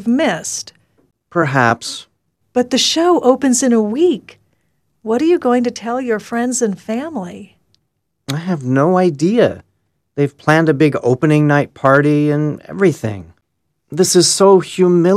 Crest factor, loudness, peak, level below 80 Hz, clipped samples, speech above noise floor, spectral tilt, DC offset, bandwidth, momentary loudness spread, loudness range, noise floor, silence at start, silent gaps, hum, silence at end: 16 dB; -15 LUFS; 0 dBFS; -58 dBFS; under 0.1%; 56 dB; -5 dB/octave; under 0.1%; 15 kHz; 13 LU; 4 LU; -70 dBFS; 0 s; none; none; 0 s